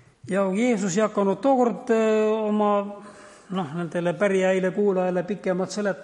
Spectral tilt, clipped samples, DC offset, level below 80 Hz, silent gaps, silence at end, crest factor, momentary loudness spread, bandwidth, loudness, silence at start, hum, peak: -6 dB/octave; under 0.1%; under 0.1%; -70 dBFS; none; 0 s; 14 dB; 8 LU; 11 kHz; -23 LUFS; 0.25 s; none; -8 dBFS